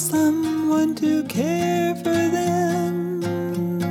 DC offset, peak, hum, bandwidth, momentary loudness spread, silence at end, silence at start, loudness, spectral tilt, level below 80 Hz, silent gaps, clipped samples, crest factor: under 0.1%; -8 dBFS; none; 17 kHz; 5 LU; 0 s; 0 s; -22 LUFS; -5.5 dB/octave; -62 dBFS; none; under 0.1%; 12 dB